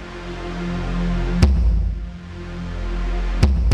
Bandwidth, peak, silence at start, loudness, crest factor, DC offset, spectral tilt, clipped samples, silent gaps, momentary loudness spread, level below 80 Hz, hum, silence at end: 9.8 kHz; -4 dBFS; 0 s; -23 LUFS; 16 dB; under 0.1%; -7 dB/octave; under 0.1%; none; 14 LU; -22 dBFS; none; 0 s